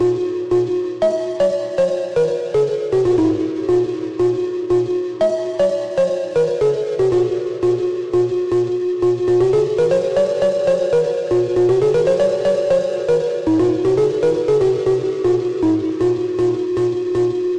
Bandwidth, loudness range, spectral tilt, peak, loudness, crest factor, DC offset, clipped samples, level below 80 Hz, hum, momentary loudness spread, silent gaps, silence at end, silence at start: 9.4 kHz; 2 LU; -7 dB/octave; -6 dBFS; -18 LUFS; 10 dB; 0.3%; under 0.1%; -50 dBFS; none; 3 LU; none; 0 s; 0 s